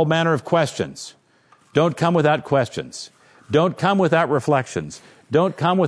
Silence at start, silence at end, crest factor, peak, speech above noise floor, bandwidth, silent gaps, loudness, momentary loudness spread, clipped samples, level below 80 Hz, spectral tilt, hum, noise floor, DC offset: 0 s; 0 s; 18 dB; -4 dBFS; 37 dB; 11 kHz; none; -20 LUFS; 18 LU; under 0.1%; -60 dBFS; -6 dB/octave; none; -56 dBFS; under 0.1%